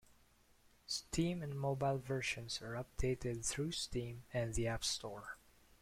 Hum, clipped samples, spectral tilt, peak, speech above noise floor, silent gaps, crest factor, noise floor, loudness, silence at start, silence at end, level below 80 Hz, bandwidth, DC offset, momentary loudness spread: none; under 0.1%; -4 dB/octave; -24 dBFS; 29 dB; none; 16 dB; -70 dBFS; -40 LUFS; 0.9 s; 0.45 s; -54 dBFS; 16.5 kHz; under 0.1%; 9 LU